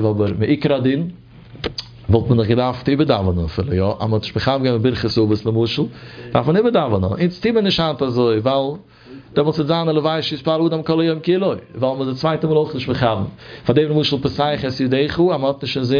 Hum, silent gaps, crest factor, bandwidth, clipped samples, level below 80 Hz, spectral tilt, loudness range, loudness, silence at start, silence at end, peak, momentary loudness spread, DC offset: none; none; 18 dB; 5.4 kHz; under 0.1%; -42 dBFS; -8 dB/octave; 1 LU; -18 LUFS; 0 s; 0 s; 0 dBFS; 6 LU; under 0.1%